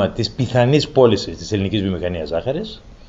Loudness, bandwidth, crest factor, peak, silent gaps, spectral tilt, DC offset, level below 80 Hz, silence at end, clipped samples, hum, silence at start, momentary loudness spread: -19 LUFS; 8 kHz; 18 dB; -2 dBFS; none; -6.5 dB/octave; 0.1%; -40 dBFS; 0 s; under 0.1%; none; 0 s; 10 LU